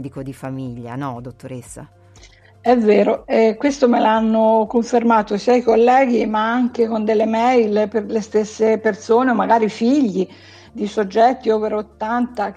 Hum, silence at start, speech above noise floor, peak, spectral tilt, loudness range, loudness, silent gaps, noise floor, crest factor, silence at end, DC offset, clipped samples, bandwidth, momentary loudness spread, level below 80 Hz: none; 0 s; 29 dB; -2 dBFS; -6 dB/octave; 3 LU; -17 LUFS; none; -46 dBFS; 16 dB; 0.05 s; under 0.1%; under 0.1%; 10.5 kHz; 15 LU; -52 dBFS